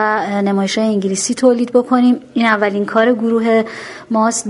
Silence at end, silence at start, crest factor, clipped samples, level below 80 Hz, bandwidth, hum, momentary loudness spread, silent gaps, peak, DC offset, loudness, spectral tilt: 0 s; 0 s; 14 dB; under 0.1%; -60 dBFS; 11.5 kHz; none; 4 LU; none; 0 dBFS; under 0.1%; -15 LUFS; -4.5 dB/octave